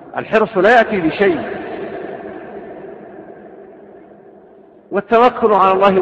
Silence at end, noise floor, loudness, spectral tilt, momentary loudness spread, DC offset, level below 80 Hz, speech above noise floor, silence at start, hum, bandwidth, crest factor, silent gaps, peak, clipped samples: 0 s; -44 dBFS; -14 LUFS; -7 dB/octave; 23 LU; under 0.1%; -52 dBFS; 31 dB; 0 s; none; 8 kHz; 16 dB; none; 0 dBFS; under 0.1%